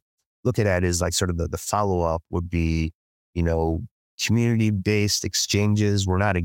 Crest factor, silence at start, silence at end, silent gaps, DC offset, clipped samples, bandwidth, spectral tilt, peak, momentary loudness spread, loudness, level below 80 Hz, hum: 16 dB; 0.45 s; 0 s; 2.95-3.33 s, 3.91-4.18 s; under 0.1%; under 0.1%; 17 kHz; -5 dB/octave; -6 dBFS; 7 LU; -23 LUFS; -38 dBFS; none